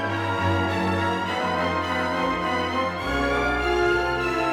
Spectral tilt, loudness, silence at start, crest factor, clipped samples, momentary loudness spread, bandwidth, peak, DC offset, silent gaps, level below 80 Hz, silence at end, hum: -5.5 dB/octave; -24 LUFS; 0 s; 12 dB; under 0.1%; 3 LU; 16.5 kHz; -10 dBFS; under 0.1%; none; -40 dBFS; 0 s; none